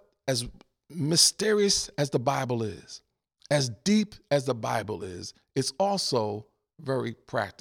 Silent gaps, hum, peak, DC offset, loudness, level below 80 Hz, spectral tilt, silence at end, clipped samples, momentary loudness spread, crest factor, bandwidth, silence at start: none; none; -6 dBFS; under 0.1%; -27 LUFS; -58 dBFS; -3.5 dB/octave; 0.1 s; under 0.1%; 18 LU; 24 dB; 18 kHz; 0.25 s